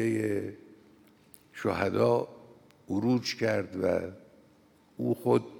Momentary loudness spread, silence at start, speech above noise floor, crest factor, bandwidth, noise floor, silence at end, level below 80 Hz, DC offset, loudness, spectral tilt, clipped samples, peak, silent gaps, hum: 12 LU; 0 s; 33 dB; 20 dB; 18 kHz; -62 dBFS; 0 s; -70 dBFS; under 0.1%; -30 LUFS; -6.5 dB/octave; under 0.1%; -10 dBFS; none; none